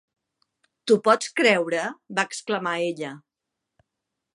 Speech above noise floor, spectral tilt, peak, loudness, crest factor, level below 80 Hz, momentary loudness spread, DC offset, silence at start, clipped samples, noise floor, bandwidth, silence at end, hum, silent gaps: 61 dB; -3.5 dB/octave; -4 dBFS; -23 LUFS; 22 dB; -80 dBFS; 12 LU; under 0.1%; 0.85 s; under 0.1%; -84 dBFS; 11.5 kHz; 1.15 s; none; none